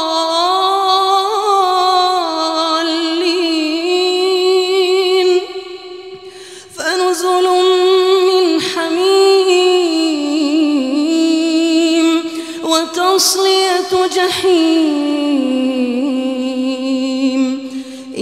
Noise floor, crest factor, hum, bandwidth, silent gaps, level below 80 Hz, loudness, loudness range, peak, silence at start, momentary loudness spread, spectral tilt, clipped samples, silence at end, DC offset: -34 dBFS; 14 dB; none; 15 kHz; none; -62 dBFS; -13 LUFS; 3 LU; 0 dBFS; 0 s; 8 LU; -2 dB/octave; under 0.1%; 0 s; 0.1%